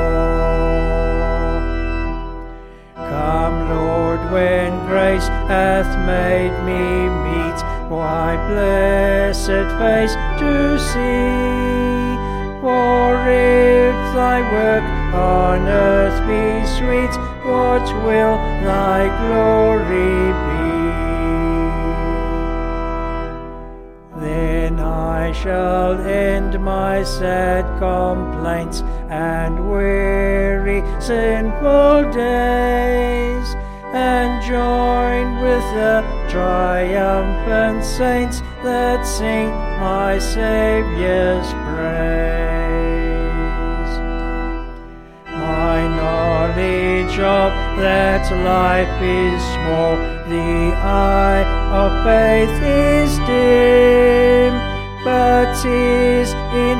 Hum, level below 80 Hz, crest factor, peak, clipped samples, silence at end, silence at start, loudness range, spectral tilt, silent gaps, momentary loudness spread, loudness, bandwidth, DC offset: none; -22 dBFS; 16 dB; 0 dBFS; under 0.1%; 0 s; 0 s; 7 LU; -6 dB/octave; none; 9 LU; -17 LUFS; 14.5 kHz; under 0.1%